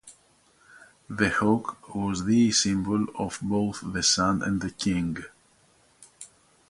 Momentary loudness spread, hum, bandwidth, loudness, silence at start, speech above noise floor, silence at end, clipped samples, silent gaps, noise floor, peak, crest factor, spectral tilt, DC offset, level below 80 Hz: 19 LU; none; 11.5 kHz; -25 LUFS; 0.05 s; 36 dB; 0.45 s; under 0.1%; none; -62 dBFS; -8 dBFS; 20 dB; -4 dB/octave; under 0.1%; -52 dBFS